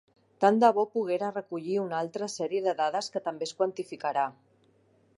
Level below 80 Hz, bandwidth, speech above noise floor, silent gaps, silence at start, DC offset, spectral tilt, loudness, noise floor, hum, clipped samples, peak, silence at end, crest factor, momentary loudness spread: -84 dBFS; 11.5 kHz; 37 dB; none; 0.4 s; under 0.1%; -5 dB/octave; -29 LUFS; -65 dBFS; none; under 0.1%; -8 dBFS; 0.85 s; 22 dB; 11 LU